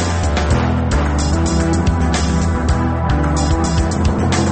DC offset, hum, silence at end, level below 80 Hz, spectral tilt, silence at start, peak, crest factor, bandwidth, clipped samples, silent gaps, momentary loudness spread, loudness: under 0.1%; none; 0 s; -20 dBFS; -6 dB/octave; 0 s; -4 dBFS; 10 dB; 8.8 kHz; under 0.1%; none; 1 LU; -16 LUFS